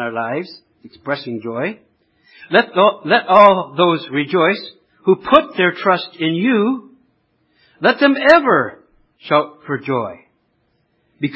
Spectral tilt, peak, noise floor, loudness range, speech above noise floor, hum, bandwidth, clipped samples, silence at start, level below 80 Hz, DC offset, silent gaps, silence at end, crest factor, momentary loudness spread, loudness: -7 dB/octave; 0 dBFS; -64 dBFS; 3 LU; 48 dB; none; 8 kHz; under 0.1%; 0 s; -58 dBFS; under 0.1%; none; 0 s; 16 dB; 15 LU; -16 LUFS